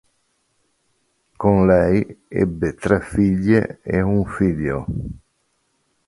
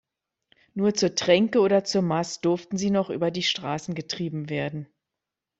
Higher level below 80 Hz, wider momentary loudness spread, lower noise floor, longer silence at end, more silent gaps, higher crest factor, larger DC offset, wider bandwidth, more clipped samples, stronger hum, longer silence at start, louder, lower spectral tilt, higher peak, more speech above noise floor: first, -38 dBFS vs -64 dBFS; about the same, 12 LU vs 10 LU; second, -68 dBFS vs -86 dBFS; first, 0.9 s vs 0.75 s; neither; about the same, 20 dB vs 20 dB; neither; first, 11.5 kHz vs 8 kHz; neither; neither; first, 1.4 s vs 0.75 s; first, -19 LUFS vs -25 LUFS; first, -9 dB/octave vs -5 dB/octave; first, -2 dBFS vs -6 dBFS; second, 49 dB vs 62 dB